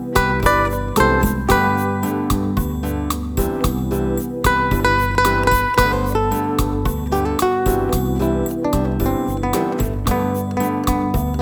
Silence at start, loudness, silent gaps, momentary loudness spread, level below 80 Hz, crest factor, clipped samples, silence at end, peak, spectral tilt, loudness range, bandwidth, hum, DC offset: 0 s; -19 LUFS; none; 5 LU; -26 dBFS; 18 dB; under 0.1%; 0 s; 0 dBFS; -6 dB/octave; 2 LU; over 20 kHz; none; under 0.1%